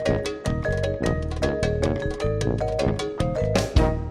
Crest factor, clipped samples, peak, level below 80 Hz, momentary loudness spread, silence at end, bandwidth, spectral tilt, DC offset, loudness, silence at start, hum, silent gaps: 18 dB; under 0.1%; -6 dBFS; -30 dBFS; 4 LU; 0 s; 14 kHz; -6 dB/octave; under 0.1%; -25 LUFS; 0 s; none; none